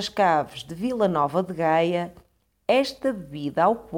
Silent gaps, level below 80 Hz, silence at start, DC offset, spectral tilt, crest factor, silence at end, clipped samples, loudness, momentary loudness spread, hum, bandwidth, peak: none; -58 dBFS; 0 s; under 0.1%; -6 dB/octave; 16 dB; 0 s; under 0.1%; -24 LUFS; 10 LU; none; 18.5 kHz; -8 dBFS